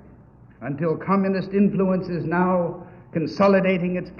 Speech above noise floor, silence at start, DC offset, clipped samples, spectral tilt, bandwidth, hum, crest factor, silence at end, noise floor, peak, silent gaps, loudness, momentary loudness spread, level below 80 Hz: 27 dB; 0.6 s; under 0.1%; under 0.1%; -9 dB/octave; 6.6 kHz; none; 16 dB; 0 s; -48 dBFS; -6 dBFS; none; -22 LUFS; 12 LU; -54 dBFS